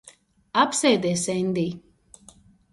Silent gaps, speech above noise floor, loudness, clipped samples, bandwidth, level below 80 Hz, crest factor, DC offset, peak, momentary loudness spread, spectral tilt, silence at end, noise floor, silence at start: none; 31 dB; -23 LUFS; under 0.1%; 11.5 kHz; -62 dBFS; 20 dB; under 0.1%; -6 dBFS; 9 LU; -4 dB/octave; 0.95 s; -54 dBFS; 0.05 s